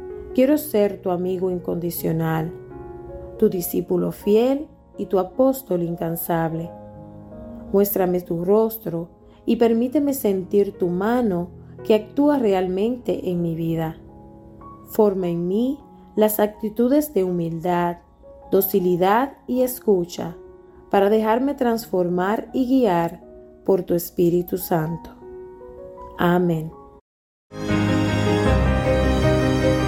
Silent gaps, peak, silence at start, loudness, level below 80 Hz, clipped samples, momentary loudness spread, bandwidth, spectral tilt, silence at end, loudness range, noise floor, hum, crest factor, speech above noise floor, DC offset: 27.01-27.50 s; -4 dBFS; 0 s; -21 LUFS; -38 dBFS; under 0.1%; 18 LU; 17 kHz; -7 dB/octave; 0 s; 3 LU; -45 dBFS; none; 18 dB; 25 dB; under 0.1%